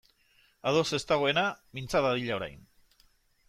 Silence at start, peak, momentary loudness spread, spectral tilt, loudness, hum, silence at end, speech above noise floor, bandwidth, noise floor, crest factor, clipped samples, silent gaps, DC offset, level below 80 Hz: 0.65 s; -14 dBFS; 9 LU; -4.5 dB/octave; -29 LUFS; none; 0.9 s; 37 dB; 15.5 kHz; -66 dBFS; 18 dB; under 0.1%; none; under 0.1%; -60 dBFS